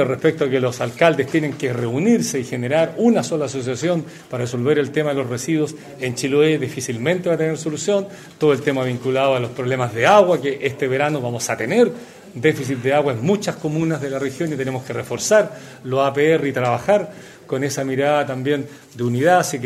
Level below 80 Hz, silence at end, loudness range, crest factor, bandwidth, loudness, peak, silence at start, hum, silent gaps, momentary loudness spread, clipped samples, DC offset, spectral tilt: -60 dBFS; 0 s; 3 LU; 18 dB; 15.5 kHz; -19 LUFS; 0 dBFS; 0 s; none; none; 8 LU; under 0.1%; under 0.1%; -5.5 dB/octave